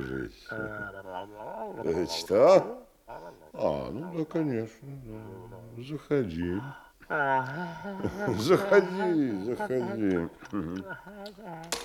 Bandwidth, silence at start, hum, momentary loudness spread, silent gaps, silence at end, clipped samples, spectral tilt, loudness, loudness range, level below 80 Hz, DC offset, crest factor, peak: 17.5 kHz; 0 s; none; 21 LU; none; 0 s; under 0.1%; -6 dB/octave; -29 LUFS; 6 LU; -58 dBFS; under 0.1%; 22 dB; -6 dBFS